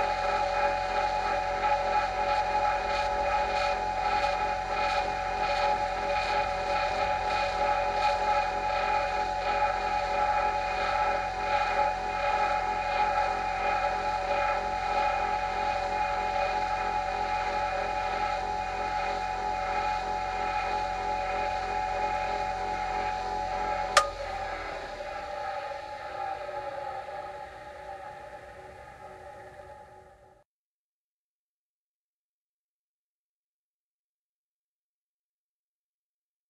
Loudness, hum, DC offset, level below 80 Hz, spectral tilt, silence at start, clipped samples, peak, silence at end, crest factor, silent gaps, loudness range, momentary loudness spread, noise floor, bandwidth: -29 LUFS; none; under 0.1%; -48 dBFS; -3 dB/octave; 0 s; under 0.1%; -6 dBFS; 6.4 s; 26 dB; none; 11 LU; 11 LU; under -90 dBFS; 12 kHz